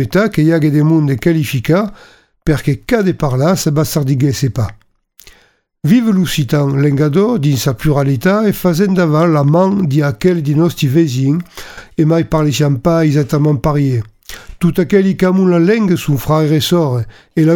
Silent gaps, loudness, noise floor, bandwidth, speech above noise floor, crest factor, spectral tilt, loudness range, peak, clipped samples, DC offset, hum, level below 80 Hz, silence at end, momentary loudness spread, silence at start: none; -13 LUFS; -51 dBFS; 18 kHz; 39 dB; 12 dB; -7 dB/octave; 3 LU; 0 dBFS; under 0.1%; under 0.1%; none; -38 dBFS; 0 s; 6 LU; 0 s